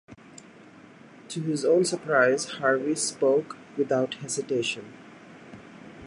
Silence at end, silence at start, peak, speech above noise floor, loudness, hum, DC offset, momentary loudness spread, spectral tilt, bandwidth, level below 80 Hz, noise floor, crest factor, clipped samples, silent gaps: 0 s; 0.1 s; -6 dBFS; 25 dB; -25 LUFS; none; under 0.1%; 24 LU; -4 dB/octave; 11.5 kHz; -70 dBFS; -50 dBFS; 20 dB; under 0.1%; none